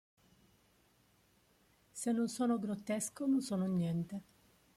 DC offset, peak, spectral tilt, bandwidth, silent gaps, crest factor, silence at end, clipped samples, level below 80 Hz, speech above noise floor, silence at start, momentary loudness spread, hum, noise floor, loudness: under 0.1%; -26 dBFS; -6 dB/octave; 15.5 kHz; none; 14 dB; 0.55 s; under 0.1%; -76 dBFS; 36 dB; 1.95 s; 9 LU; none; -71 dBFS; -36 LUFS